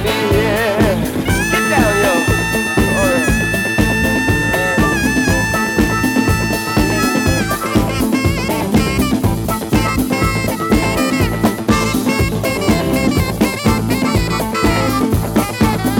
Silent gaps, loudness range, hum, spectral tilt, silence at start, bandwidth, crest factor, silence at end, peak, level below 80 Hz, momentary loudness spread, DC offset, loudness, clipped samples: none; 2 LU; none; -5 dB/octave; 0 s; 19 kHz; 14 dB; 0 s; 0 dBFS; -26 dBFS; 3 LU; under 0.1%; -15 LUFS; under 0.1%